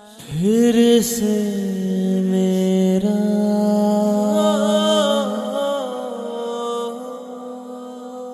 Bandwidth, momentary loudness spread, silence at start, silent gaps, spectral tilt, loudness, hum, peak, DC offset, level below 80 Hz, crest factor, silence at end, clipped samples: 14 kHz; 17 LU; 0 s; none; -5.5 dB/octave; -18 LUFS; none; -4 dBFS; under 0.1%; -58 dBFS; 14 dB; 0 s; under 0.1%